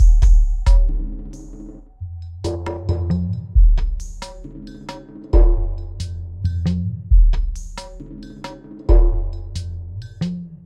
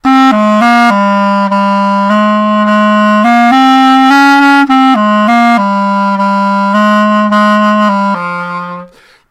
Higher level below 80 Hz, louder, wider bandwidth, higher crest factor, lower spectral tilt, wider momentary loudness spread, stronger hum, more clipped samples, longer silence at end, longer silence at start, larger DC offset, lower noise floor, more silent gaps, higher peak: first, -18 dBFS vs -54 dBFS; second, -21 LUFS vs -7 LUFS; second, 7.8 kHz vs 12.5 kHz; first, 16 dB vs 8 dB; first, -7.5 dB/octave vs -6 dB/octave; first, 19 LU vs 6 LU; neither; neither; second, 0.1 s vs 0.45 s; about the same, 0 s vs 0.05 s; neither; about the same, -37 dBFS vs -34 dBFS; neither; about the same, -2 dBFS vs 0 dBFS